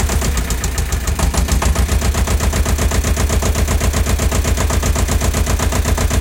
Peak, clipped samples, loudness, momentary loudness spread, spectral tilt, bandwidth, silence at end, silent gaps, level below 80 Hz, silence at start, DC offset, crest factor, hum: -2 dBFS; under 0.1%; -17 LUFS; 2 LU; -4.5 dB/octave; 17 kHz; 0 s; none; -18 dBFS; 0 s; under 0.1%; 12 dB; none